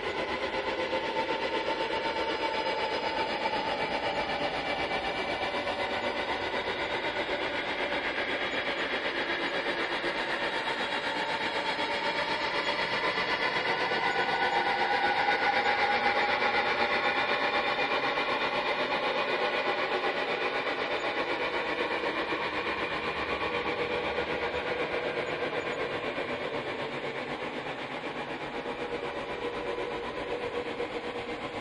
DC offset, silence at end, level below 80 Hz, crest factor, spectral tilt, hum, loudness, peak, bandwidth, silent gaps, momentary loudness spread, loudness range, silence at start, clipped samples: under 0.1%; 0 s; -58 dBFS; 16 dB; -4 dB/octave; none; -30 LUFS; -14 dBFS; 11.5 kHz; none; 8 LU; 8 LU; 0 s; under 0.1%